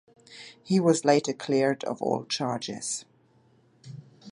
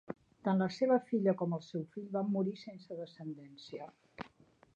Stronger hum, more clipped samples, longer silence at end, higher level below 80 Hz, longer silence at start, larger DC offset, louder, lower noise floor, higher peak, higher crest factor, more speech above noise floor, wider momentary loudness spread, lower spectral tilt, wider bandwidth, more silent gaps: neither; neither; second, 0 s vs 0.5 s; about the same, -74 dBFS vs -78 dBFS; first, 0.3 s vs 0.1 s; neither; first, -26 LUFS vs -35 LUFS; about the same, -62 dBFS vs -65 dBFS; first, -6 dBFS vs -18 dBFS; about the same, 22 dB vs 18 dB; first, 36 dB vs 30 dB; first, 24 LU vs 20 LU; second, -4.5 dB/octave vs -8 dB/octave; first, 11.5 kHz vs 7.4 kHz; neither